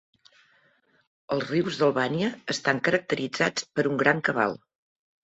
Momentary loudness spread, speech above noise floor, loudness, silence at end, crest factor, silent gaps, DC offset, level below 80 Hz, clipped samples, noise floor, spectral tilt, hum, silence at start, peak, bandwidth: 6 LU; 40 dB; -26 LUFS; 0.65 s; 22 dB; none; under 0.1%; -66 dBFS; under 0.1%; -65 dBFS; -4.5 dB/octave; none; 1.3 s; -4 dBFS; 8.2 kHz